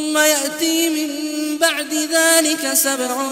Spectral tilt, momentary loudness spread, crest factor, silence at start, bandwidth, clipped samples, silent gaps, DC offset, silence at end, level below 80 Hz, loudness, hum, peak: 0.5 dB/octave; 9 LU; 18 dB; 0 s; 16.5 kHz; under 0.1%; none; under 0.1%; 0 s; -68 dBFS; -16 LUFS; none; 0 dBFS